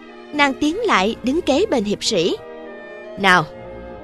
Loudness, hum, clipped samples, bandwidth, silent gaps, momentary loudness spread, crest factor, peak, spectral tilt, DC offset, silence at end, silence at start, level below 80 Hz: -18 LUFS; none; under 0.1%; 13.5 kHz; none; 20 LU; 20 dB; 0 dBFS; -4 dB/octave; under 0.1%; 0 s; 0 s; -46 dBFS